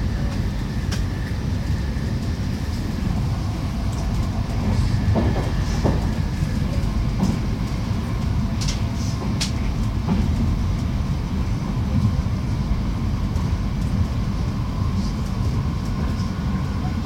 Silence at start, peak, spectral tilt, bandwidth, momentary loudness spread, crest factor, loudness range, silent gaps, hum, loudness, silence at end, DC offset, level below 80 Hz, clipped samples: 0 s; -8 dBFS; -6.5 dB/octave; 16 kHz; 4 LU; 14 dB; 2 LU; none; none; -24 LUFS; 0 s; under 0.1%; -26 dBFS; under 0.1%